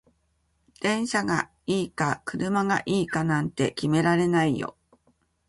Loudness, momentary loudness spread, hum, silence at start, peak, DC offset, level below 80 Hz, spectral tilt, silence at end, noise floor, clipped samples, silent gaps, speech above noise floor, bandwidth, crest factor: -25 LUFS; 6 LU; none; 0.8 s; -8 dBFS; under 0.1%; -58 dBFS; -5.5 dB/octave; 0.75 s; -70 dBFS; under 0.1%; none; 45 dB; 11.5 kHz; 18 dB